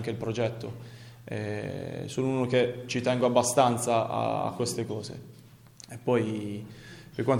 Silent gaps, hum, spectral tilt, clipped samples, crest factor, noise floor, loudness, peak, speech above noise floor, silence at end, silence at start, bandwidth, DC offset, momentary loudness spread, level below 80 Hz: none; none; -5 dB/octave; under 0.1%; 22 dB; -51 dBFS; -29 LUFS; -8 dBFS; 23 dB; 0 s; 0 s; 18 kHz; under 0.1%; 20 LU; -64 dBFS